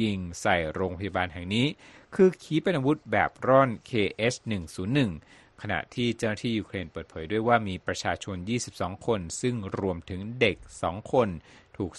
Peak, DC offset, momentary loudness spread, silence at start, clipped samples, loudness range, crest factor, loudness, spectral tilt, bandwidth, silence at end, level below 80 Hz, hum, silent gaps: -6 dBFS; under 0.1%; 11 LU; 0 s; under 0.1%; 4 LU; 22 dB; -28 LUFS; -5.5 dB/octave; 12 kHz; 0 s; -54 dBFS; none; none